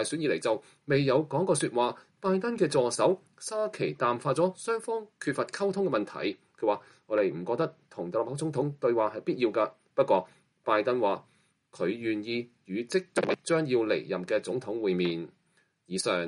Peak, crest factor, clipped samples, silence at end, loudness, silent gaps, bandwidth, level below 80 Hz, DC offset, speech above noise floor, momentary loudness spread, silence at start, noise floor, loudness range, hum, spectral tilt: -12 dBFS; 18 dB; under 0.1%; 0 s; -30 LUFS; none; 11.5 kHz; -74 dBFS; under 0.1%; 42 dB; 8 LU; 0 s; -70 dBFS; 3 LU; none; -5 dB/octave